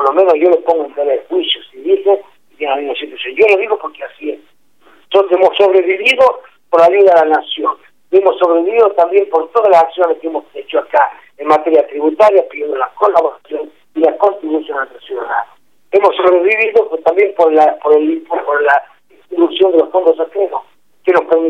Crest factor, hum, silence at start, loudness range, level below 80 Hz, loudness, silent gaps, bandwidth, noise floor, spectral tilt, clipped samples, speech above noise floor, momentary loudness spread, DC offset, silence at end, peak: 12 dB; 50 Hz at -75 dBFS; 0 s; 5 LU; -62 dBFS; -12 LUFS; none; 8.4 kHz; -51 dBFS; -4 dB/octave; under 0.1%; 39 dB; 12 LU; 0.3%; 0 s; 0 dBFS